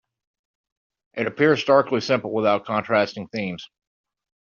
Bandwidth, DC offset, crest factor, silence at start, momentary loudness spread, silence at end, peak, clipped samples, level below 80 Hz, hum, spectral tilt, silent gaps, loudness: 7.2 kHz; under 0.1%; 20 dB; 1.15 s; 11 LU; 0.95 s; -4 dBFS; under 0.1%; -66 dBFS; none; -4 dB/octave; none; -22 LUFS